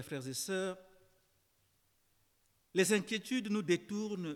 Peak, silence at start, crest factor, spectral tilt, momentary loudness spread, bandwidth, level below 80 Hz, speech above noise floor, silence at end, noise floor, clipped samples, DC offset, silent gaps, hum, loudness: -18 dBFS; 0 s; 20 dB; -4 dB/octave; 9 LU; 17.5 kHz; -80 dBFS; 39 dB; 0 s; -75 dBFS; under 0.1%; under 0.1%; none; none; -35 LUFS